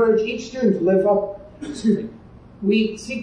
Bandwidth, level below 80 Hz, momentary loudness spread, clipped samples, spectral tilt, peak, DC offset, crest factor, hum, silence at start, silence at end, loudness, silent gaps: 10.5 kHz; -52 dBFS; 15 LU; under 0.1%; -6.5 dB/octave; -6 dBFS; under 0.1%; 14 dB; none; 0 s; 0 s; -21 LUFS; none